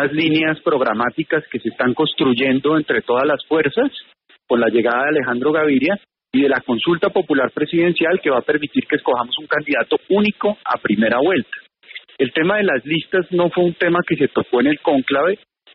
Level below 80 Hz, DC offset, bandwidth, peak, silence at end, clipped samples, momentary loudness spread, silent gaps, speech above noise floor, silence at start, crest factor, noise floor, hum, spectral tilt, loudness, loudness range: -60 dBFS; under 0.1%; 5.4 kHz; -4 dBFS; 0.4 s; under 0.1%; 5 LU; none; 23 dB; 0 s; 14 dB; -40 dBFS; none; -3.5 dB/octave; -18 LUFS; 1 LU